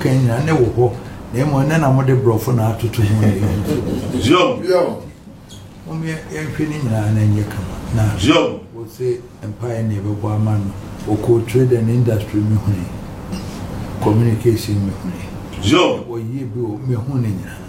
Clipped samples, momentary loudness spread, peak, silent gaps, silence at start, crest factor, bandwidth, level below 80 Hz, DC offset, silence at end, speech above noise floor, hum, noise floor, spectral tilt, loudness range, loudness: under 0.1%; 14 LU; 0 dBFS; none; 0 s; 16 dB; 16 kHz; -38 dBFS; under 0.1%; 0 s; 21 dB; none; -37 dBFS; -7 dB/octave; 4 LU; -18 LUFS